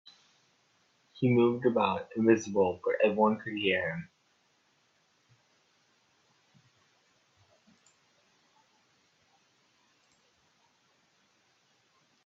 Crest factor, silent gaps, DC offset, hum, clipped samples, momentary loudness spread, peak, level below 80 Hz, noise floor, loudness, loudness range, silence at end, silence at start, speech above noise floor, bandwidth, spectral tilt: 24 dB; none; under 0.1%; none; under 0.1%; 6 LU; -10 dBFS; -76 dBFS; -71 dBFS; -28 LUFS; 10 LU; 8.2 s; 1.15 s; 44 dB; 7.6 kHz; -6.5 dB/octave